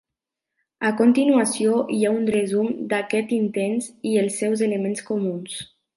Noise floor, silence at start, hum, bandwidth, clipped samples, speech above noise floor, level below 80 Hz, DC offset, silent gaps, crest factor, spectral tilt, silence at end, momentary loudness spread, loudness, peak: -85 dBFS; 0.8 s; none; 11.5 kHz; under 0.1%; 64 dB; -68 dBFS; under 0.1%; none; 16 dB; -5 dB/octave; 0.3 s; 8 LU; -22 LUFS; -6 dBFS